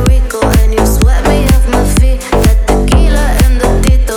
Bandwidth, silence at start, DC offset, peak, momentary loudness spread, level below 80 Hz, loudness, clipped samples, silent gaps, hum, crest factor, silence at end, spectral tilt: 18 kHz; 0 s; under 0.1%; 0 dBFS; 2 LU; -8 dBFS; -10 LUFS; 0.4%; none; none; 8 dB; 0 s; -5.5 dB/octave